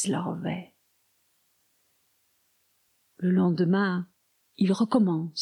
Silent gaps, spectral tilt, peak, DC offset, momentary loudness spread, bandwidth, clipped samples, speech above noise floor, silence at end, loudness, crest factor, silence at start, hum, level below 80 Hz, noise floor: none; -6 dB/octave; -12 dBFS; under 0.1%; 11 LU; 11.5 kHz; under 0.1%; 45 dB; 0 s; -26 LUFS; 18 dB; 0 s; none; -74 dBFS; -70 dBFS